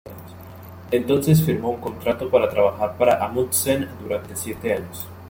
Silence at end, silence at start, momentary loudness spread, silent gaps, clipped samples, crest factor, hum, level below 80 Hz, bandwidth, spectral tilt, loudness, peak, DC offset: 0 s; 0.05 s; 22 LU; none; under 0.1%; 18 dB; none; -52 dBFS; 17 kHz; -5.5 dB/octave; -21 LUFS; -4 dBFS; under 0.1%